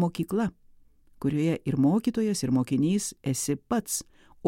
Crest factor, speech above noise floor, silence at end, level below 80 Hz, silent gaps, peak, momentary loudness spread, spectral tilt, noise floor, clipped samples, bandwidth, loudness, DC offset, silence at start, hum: 16 dB; 30 dB; 0 s; -58 dBFS; none; -12 dBFS; 7 LU; -5.5 dB/octave; -56 dBFS; under 0.1%; 16.5 kHz; -27 LUFS; under 0.1%; 0 s; none